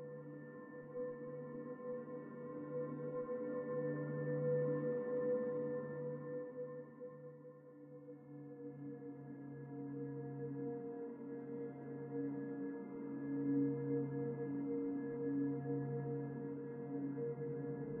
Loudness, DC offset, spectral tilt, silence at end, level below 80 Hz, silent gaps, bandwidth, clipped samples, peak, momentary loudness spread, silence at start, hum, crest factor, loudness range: -44 LUFS; under 0.1%; -7.5 dB/octave; 0 s; -84 dBFS; none; 2.8 kHz; under 0.1%; -28 dBFS; 14 LU; 0 s; none; 14 dB; 9 LU